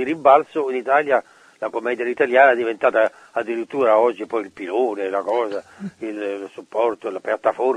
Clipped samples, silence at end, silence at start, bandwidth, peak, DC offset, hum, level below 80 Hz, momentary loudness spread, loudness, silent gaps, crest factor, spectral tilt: under 0.1%; 0 s; 0 s; 10 kHz; 0 dBFS; under 0.1%; none; -70 dBFS; 13 LU; -20 LUFS; none; 20 dB; -5.5 dB/octave